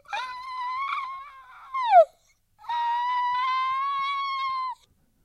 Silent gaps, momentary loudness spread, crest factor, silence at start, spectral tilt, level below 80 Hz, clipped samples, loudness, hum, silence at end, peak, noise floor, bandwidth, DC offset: none; 17 LU; 20 dB; 0.1 s; -0.5 dB/octave; -68 dBFS; under 0.1%; -26 LUFS; none; 0.5 s; -6 dBFS; -63 dBFS; 10 kHz; under 0.1%